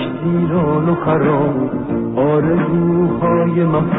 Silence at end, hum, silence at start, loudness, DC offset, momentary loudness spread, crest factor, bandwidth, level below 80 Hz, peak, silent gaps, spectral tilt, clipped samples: 0 s; none; 0 s; -16 LUFS; 0.4%; 4 LU; 10 dB; 3.9 kHz; -44 dBFS; -4 dBFS; none; -14 dB/octave; under 0.1%